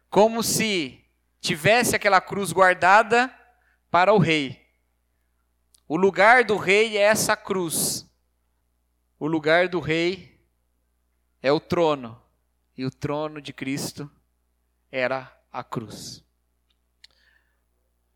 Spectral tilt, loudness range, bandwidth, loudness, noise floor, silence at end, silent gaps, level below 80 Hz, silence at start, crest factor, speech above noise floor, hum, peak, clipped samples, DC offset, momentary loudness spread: -3.5 dB/octave; 13 LU; 18.5 kHz; -21 LUFS; -71 dBFS; 2 s; none; -60 dBFS; 0.1 s; 22 dB; 49 dB; 60 Hz at -60 dBFS; -2 dBFS; under 0.1%; under 0.1%; 17 LU